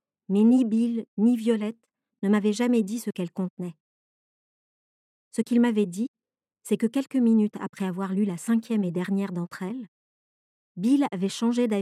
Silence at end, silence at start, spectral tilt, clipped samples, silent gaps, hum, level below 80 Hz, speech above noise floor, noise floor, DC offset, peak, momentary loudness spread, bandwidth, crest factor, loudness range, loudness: 0 s; 0.3 s; -6.5 dB/octave; under 0.1%; 1.08-1.17 s, 3.50-3.57 s, 3.80-5.31 s, 6.08-6.14 s, 7.69-7.73 s, 9.88-10.75 s; none; -84 dBFS; 56 dB; -80 dBFS; under 0.1%; -12 dBFS; 12 LU; 13.5 kHz; 14 dB; 5 LU; -25 LUFS